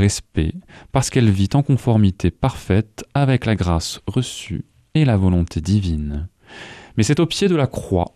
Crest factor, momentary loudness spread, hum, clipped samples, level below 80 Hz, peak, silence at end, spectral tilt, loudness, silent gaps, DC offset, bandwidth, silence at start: 16 dB; 12 LU; none; under 0.1%; -34 dBFS; -2 dBFS; 0.05 s; -6 dB/octave; -19 LUFS; none; under 0.1%; 13.5 kHz; 0 s